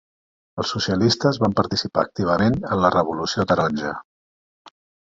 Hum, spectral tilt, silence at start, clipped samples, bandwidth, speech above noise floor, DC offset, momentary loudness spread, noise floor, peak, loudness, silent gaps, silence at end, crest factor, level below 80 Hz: none; -5.5 dB/octave; 0.55 s; under 0.1%; 7.8 kHz; over 70 dB; under 0.1%; 9 LU; under -90 dBFS; -2 dBFS; -21 LUFS; none; 1.05 s; 20 dB; -48 dBFS